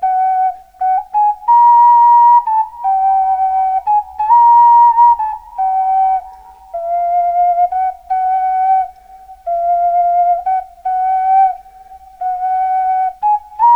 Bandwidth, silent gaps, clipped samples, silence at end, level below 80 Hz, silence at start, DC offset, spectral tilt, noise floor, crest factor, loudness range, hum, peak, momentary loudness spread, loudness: 3.3 kHz; none; under 0.1%; 0 s; -50 dBFS; 0 s; 0.1%; -3.5 dB/octave; -38 dBFS; 12 dB; 6 LU; none; -2 dBFS; 13 LU; -12 LUFS